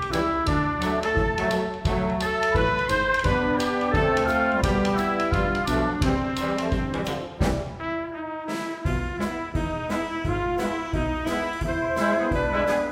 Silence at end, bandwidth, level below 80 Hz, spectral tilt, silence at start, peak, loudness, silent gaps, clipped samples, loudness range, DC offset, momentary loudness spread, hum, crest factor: 0 s; 16 kHz; -34 dBFS; -6 dB/octave; 0 s; -8 dBFS; -25 LUFS; none; under 0.1%; 6 LU; under 0.1%; 7 LU; none; 16 dB